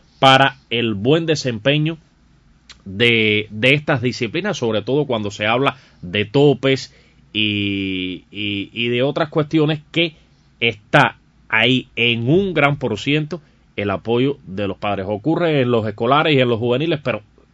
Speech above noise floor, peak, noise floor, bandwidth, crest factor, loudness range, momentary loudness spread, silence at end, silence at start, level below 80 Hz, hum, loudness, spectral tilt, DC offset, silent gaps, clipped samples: 35 dB; 0 dBFS; -53 dBFS; 11 kHz; 18 dB; 3 LU; 9 LU; 0.35 s; 0.2 s; -54 dBFS; none; -18 LUFS; -6 dB/octave; under 0.1%; none; under 0.1%